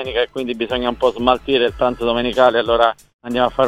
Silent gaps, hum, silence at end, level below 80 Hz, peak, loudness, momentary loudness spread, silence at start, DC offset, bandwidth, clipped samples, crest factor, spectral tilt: 3.14-3.19 s; none; 0 s; -40 dBFS; 0 dBFS; -17 LUFS; 7 LU; 0 s; 0.1%; 13 kHz; under 0.1%; 18 dB; -5.5 dB/octave